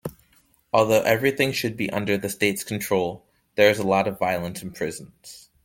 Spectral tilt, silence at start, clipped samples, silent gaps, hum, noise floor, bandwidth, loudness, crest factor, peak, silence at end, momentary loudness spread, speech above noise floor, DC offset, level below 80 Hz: -4.5 dB/octave; 0.05 s; under 0.1%; none; none; -62 dBFS; 17 kHz; -23 LUFS; 22 dB; -2 dBFS; 0.25 s; 19 LU; 39 dB; under 0.1%; -58 dBFS